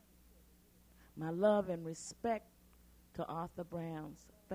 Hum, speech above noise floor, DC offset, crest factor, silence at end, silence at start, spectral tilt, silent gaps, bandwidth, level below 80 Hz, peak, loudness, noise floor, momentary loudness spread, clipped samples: 60 Hz at -65 dBFS; 27 dB; under 0.1%; 20 dB; 0 s; 1 s; -6 dB/octave; none; 16 kHz; -68 dBFS; -20 dBFS; -39 LUFS; -66 dBFS; 20 LU; under 0.1%